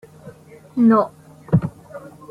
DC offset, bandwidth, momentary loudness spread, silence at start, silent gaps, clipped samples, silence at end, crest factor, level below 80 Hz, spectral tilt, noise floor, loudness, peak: under 0.1%; 5 kHz; 23 LU; 0.25 s; none; under 0.1%; 0.3 s; 18 dB; -50 dBFS; -10 dB/octave; -42 dBFS; -19 LUFS; -4 dBFS